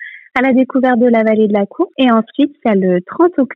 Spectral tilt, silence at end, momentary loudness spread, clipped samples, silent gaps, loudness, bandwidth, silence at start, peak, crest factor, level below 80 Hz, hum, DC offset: -9 dB/octave; 0 s; 5 LU; under 0.1%; none; -13 LUFS; 4.8 kHz; 0 s; -2 dBFS; 10 dB; -58 dBFS; none; under 0.1%